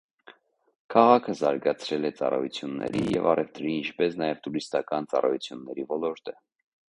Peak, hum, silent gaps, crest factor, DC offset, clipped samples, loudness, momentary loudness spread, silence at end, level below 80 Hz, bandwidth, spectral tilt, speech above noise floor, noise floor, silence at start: -4 dBFS; none; none; 24 dB; under 0.1%; under 0.1%; -27 LUFS; 11 LU; 0.65 s; -64 dBFS; 10.5 kHz; -6 dB/octave; 29 dB; -55 dBFS; 0.9 s